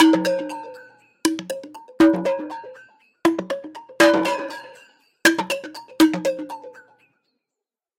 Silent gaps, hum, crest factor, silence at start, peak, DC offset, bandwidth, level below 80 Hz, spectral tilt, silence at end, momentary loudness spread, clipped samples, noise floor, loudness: none; none; 18 dB; 0 s; -4 dBFS; under 0.1%; 16.5 kHz; -64 dBFS; -4 dB/octave; 1.2 s; 21 LU; under 0.1%; -86 dBFS; -21 LUFS